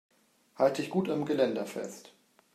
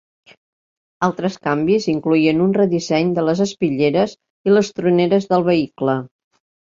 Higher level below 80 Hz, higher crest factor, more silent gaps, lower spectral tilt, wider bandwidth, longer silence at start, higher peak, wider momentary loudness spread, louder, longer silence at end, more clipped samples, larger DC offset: second, -80 dBFS vs -58 dBFS; about the same, 20 dB vs 16 dB; second, none vs 4.30-4.44 s; about the same, -6 dB/octave vs -6.5 dB/octave; first, 14.5 kHz vs 7.6 kHz; second, 0.6 s vs 1 s; second, -12 dBFS vs -2 dBFS; first, 13 LU vs 6 LU; second, -31 LUFS vs -18 LUFS; second, 0.45 s vs 0.6 s; neither; neither